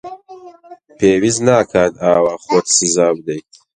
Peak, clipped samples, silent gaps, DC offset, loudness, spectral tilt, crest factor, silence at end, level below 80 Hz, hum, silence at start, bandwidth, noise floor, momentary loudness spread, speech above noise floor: 0 dBFS; under 0.1%; none; under 0.1%; -14 LUFS; -3.5 dB/octave; 16 dB; 0.35 s; -50 dBFS; none; 0.05 s; 10 kHz; -41 dBFS; 14 LU; 27 dB